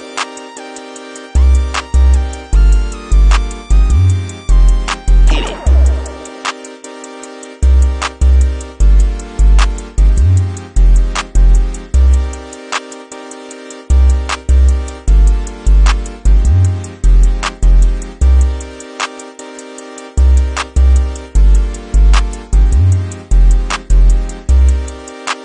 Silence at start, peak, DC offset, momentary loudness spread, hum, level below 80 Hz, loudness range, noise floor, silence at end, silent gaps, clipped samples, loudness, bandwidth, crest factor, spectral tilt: 0 s; 0 dBFS; under 0.1%; 17 LU; none; -10 dBFS; 3 LU; -30 dBFS; 0 s; none; under 0.1%; -14 LUFS; 9.8 kHz; 10 dB; -5.5 dB/octave